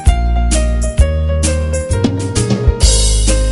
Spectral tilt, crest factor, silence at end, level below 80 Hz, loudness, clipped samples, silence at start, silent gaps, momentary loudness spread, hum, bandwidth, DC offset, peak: -4.5 dB/octave; 12 dB; 0 s; -14 dBFS; -14 LUFS; 0.2%; 0 s; none; 5 LU; none; 11.5 kHz; under 0.1%; 0 dBFS